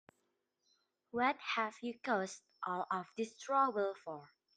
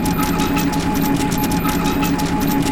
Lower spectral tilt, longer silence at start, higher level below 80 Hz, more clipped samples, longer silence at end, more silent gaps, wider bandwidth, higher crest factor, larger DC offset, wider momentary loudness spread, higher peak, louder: about the same, -4 dB/octave vs -5 dB/octave; first, 1.15 s vs 0 s; second, -88 dBFS vs -30 dBFS; neither; first, 0.3 s vs 0 s; neither; second, 10 kHz vs 19 kHz; first, 20 dB vs 14 dB; neither; first, 12 LU vs 1 LU; second, -20 dBFS vs -4 dBFS; second, -38 LUFS vs -18 LUFS